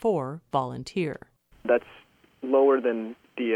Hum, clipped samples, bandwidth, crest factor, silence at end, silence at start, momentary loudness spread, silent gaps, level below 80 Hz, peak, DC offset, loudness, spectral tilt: none; under 0.1%; 10.5 kHz; 18 dB; 0 s; 0 s; 15 LU; none; -64 dBFS; -8 dBFS; under 0.1%; -26 LUFS; -7 dB/octave